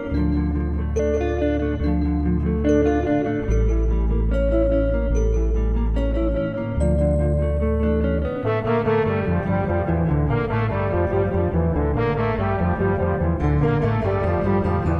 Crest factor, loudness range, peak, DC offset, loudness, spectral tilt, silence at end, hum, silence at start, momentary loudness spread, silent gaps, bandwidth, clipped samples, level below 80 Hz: 12 dB; 1 LU; -8 dBFS; under 0.1%; -21 LUFS; -9 dB/octave; 0 s; none; 0 s; 3 LU; none; 8.6 kHz; under 0.1%; -24 dBFS